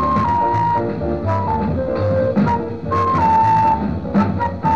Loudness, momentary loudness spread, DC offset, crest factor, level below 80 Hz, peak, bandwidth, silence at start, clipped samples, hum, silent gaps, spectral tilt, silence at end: -17 LUFS; 6 LU; 1%; 14 dB; -36 dBFS; -4 dBFS; 7.4 kHz; 0 s; under 0.1%; none; none; -9 dB/octave; 0 s